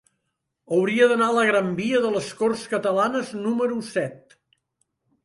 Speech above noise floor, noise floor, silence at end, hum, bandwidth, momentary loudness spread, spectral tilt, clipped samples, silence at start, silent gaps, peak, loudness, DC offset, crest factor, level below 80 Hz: 56 dB; -78 dBFS; 1.1 s; none; 11.5 kHz; 8 LU; -5 dB/octave; under 0.1%; 0.7 s; none; -6 dBFS; -22 LUFS; under 0.1%; 18 dB; -68 dBFS